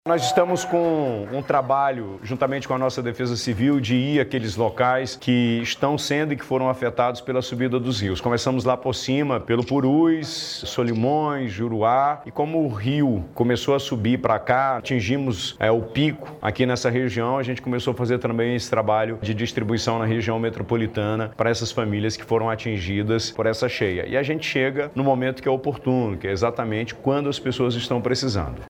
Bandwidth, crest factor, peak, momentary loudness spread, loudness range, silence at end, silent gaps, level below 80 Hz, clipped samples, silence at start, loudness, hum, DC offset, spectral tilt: 16.5 kHz; 18 dB; -4 dBFS; 5 LU; 2 LU; 0 s; none; -50 dBFS; under 0.1%; 0.05 s; -23 LUFS; none; under 0.1%; -5.5 dB/octave